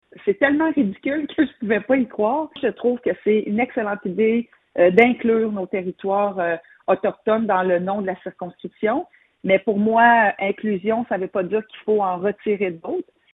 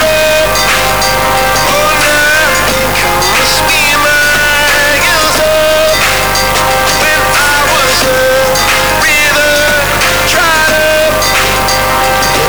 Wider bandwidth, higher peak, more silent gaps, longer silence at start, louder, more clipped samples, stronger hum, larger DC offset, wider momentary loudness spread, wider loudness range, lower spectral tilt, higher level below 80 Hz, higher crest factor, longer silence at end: second, 4 kHz vs over 20 kHz; first, 0 dBFS vs -6 dBFS; neither; first, 0.25 s vs 0 s; second, -21 LUFS vs -7 LUFS; neither; second, none vs 50 Hz at -25 dBFS; second, under 0.1% vs 5%; first, 11 LU vs 2 LU; about the same, 3 LU vs 1 LU; first, -9 dB/octave vs -2 dB/octave; second, -62 dBFS vs -26 dBFS; first, 20 dB vs 4 dB; first, 0.3 s vs 0 s